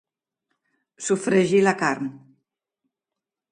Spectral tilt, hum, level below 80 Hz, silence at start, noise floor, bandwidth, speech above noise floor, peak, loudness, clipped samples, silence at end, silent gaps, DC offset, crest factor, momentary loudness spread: -5 dB/octave; none; -70 dBFS; 1 s; -87 dBFS; 11 kHz; 66 dB; -4 dBFS; -21 LUFS; under 0.1%; 1.35 s; none; under 0.1%; 22 dB; 13 LU